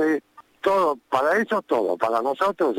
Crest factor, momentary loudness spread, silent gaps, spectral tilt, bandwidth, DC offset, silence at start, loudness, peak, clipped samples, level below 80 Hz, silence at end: 16 dB; 3 LU; none; -5 dB/octave; 17 kHz; under 0.1%; 0 s; -23 LUFS; -6 dBFS; under 0.1%; -64 dBFS; 0 s